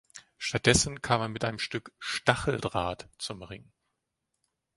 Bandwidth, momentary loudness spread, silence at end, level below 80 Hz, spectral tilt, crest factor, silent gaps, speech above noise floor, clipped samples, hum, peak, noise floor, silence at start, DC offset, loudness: 12 kHz; 15 LU; 1.2 s; -50 dBFS; -3.5 dB/octave; 28 dB; none; 53 dB; under 0.1%; none; -4 dBFS; -83 dBFS; 0.15 s; under 0.1%; -29 LUFS